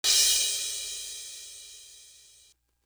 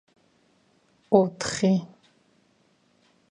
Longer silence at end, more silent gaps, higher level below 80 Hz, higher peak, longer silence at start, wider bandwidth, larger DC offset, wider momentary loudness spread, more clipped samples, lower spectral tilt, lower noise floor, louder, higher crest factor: second, 0.8 s vs 1.45 s; neither; about the same, -62 dBFS vs -66 dBFS; second, -8 dBFS vs -4 dBFS; second, 0.05 s vs 1.1 s; first, over 20 kHz vs 11 kHz; neither; first, 26 LU vs 6 LU; neither; second, 4 dB/octave vs -5.5 dB/octave; about the same, -62 dBFS vs -65 dBFS; about the same, -25 LUFS vs -24 LUFS; about the same, 22 dB vs 24 dB